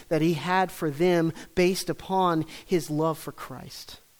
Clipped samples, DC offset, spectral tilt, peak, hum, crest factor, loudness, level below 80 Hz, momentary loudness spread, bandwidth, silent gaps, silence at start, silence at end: under 0.1%; under 0.1%; -5.5 dB/octave; -10 dBFS; none; 16 dB; -26 LUFS; -54 dBFS; 16 LU; over 20 kHz; none; 0 s; 0.25 s